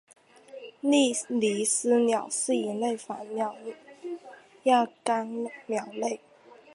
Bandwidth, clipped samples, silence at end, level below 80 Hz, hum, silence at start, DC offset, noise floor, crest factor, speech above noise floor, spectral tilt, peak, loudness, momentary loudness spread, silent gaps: 11.5 kHz; under 0.1%; 0.6 s; -82 dBFS; none; 0.5 s; under 0.1%; -47 dBFS; 20 dB; 20 dB; -3 dB/octave; -10 dBFS; -27 LUFS; 18 LU; none